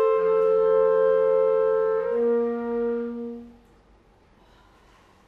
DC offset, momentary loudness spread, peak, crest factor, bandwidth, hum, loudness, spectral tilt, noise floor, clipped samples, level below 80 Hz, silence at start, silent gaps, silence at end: under 0.1%; 12 LU; -12 dBFS; 12 dB; 4.2 kHz; none; -22 LUFS; -8 dB/octave; -57 dBFS; under 0.1%; -60 dBFS; 0 s; none; 1.8 s